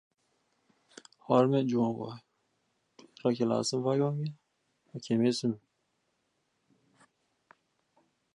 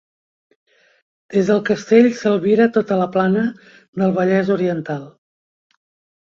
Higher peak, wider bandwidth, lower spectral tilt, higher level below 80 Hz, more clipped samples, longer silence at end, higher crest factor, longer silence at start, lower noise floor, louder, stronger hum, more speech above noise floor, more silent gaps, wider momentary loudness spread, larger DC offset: second, -12 dBFS vs -2 dBFS; first, 11 kHz vs 7.4 kHz; about the same, -6.5 dB/octave vs -7.5 dB/octave; second, -78 dBFS vs -62 dBFS; neither; first, 2.75 s vs 1.3 s; about the same, 22 dB vs 18 dB; about the same, 1.3 s vs 1.3 s; second, -78 dBFS vs under -90 dBFS; second, -30 LUFS vs -17 LUFS; neither; second, 49 dB vs over 73 dB; second, none vs 3.88-3.93 s; first, 18 LU vs 11 LU; neither